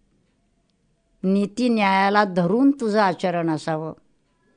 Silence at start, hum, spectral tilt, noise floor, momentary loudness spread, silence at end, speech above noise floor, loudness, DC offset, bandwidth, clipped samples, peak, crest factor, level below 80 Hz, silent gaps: 1.25 s; none; -6.5 dB/octave; -66 dBFS; 10 LU; 0.65 s; 46 dB; -21 LUFS; under 0.1%; 10 kHz; under 0.1%; -4 dBFS; 18 dB; -66 dBFS; none